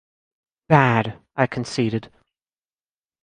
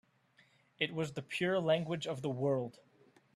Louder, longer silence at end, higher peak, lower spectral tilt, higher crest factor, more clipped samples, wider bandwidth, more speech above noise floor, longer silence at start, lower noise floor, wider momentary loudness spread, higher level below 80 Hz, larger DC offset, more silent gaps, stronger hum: first, -21 LUFS vs -36 LUFS; first, 1.15 s vs 0.65 s; first, -2 dBFS vs -16 dBFS; about the same, -6.5 dB/octave vs -6 dB/octave; about the same, 22 dB vs 22 dB; neither; second, 10.5 kHz vs 13.5 kHz; first, over 71 dB vs 34 dB; about the same, 0.7 s vs 0.8 s; first, under -90 dBFS vs -69 dBFS; first, 11 LU vs 7 LU; first, -56 dBFS vs -76 dBFS; neither; neither; neither